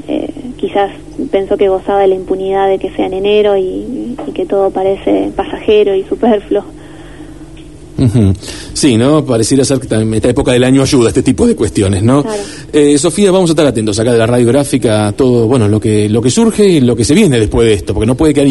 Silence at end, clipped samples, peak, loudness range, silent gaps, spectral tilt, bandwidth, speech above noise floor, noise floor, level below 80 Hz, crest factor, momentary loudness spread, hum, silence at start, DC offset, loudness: 0 s; under 0.1%; 0 dBFS; 4 LU; none; -6 dB/octave; 12 kHz; 22 dB; -32 dBFS; -32 dBFS; 10 dB; 10 LU; none; 0.05 s; 1%; -11 LUFS